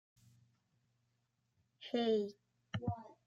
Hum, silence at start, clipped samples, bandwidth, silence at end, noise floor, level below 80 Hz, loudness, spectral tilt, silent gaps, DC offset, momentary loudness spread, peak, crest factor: none; 1.8 s; under 0.1%; 7.6 kHz; 0.15 s; -82 dBFS; -76 dBFS; -39 LUFS; -7 dB/octave; none; under 0.1%; 12 LU; -24 dBFS; 18 dB